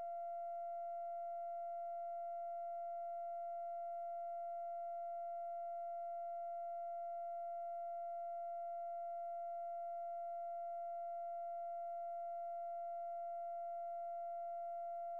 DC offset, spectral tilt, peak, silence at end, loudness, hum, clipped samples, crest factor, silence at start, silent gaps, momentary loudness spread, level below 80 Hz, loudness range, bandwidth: under 0.1%; -4 dB/octave; -42 dBFS; 0 s; -46 LUFS; none; under 0.1%; 4 dB; 0 s; none; 0 LU; under -90 dBFS; 0 LU; 2.9 kHz